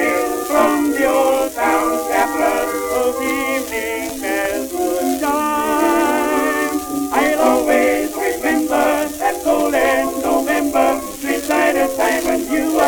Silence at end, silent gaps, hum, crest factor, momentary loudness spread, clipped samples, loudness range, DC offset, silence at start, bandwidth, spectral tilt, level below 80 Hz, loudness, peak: 0 s; none; none; 16 dB; 5 LU; under 0.1%; 2 LU; under 0.1%; 0 s; over 20 kHz; -3 dB/octave; -44 dBFS; -17 LUFS; -2 dBFS